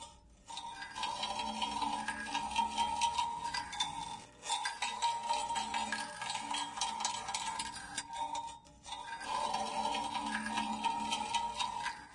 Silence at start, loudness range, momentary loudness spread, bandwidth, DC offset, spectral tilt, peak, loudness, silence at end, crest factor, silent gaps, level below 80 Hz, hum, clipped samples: 0 s; 3 LU; 9 LU; 11.5 kHz; under 0.1%; -1 dB/octave; -20 dBFS; -37 LUFS; 0 s; 18 dB; none; -64 dBFS; none; under 0.1%